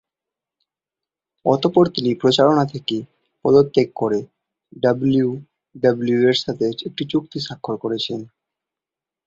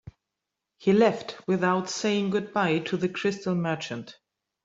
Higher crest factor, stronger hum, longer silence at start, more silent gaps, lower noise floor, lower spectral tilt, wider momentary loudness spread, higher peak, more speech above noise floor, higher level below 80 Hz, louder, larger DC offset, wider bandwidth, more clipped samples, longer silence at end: about the same, 20 dB vs 18 dB; neither; first, 1.45 s vs 0.05 s; neither; about the same, -88 dBFS vs -85 dBFS; about the same, -6.5 dB/octave vs -5.5 dB/octave; about the same, 11 LU vs 11 LU; first, -2 dBFS vs -10 dBFS; first, 70 dB vs 60 dB; first, -58 dBFS vs -66 dBFS; first, -19 LUFS vs -26 LUFS; neither; about the same, 7.8 kHz vs 8 kHz; neither; first, 1 s vs 0.55 s